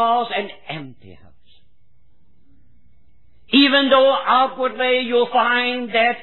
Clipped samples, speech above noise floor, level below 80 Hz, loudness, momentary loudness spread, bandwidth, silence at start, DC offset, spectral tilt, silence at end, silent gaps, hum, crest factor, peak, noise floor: under 0.1%; 44 dB; -62 dBFS; -17 LUFS; 15 LU; 4.3 kHz; 0 s; 0.8%; -6.5 dB/octave; 0 s; none; none; 18 dB; -2 dBFS; -61 dBFS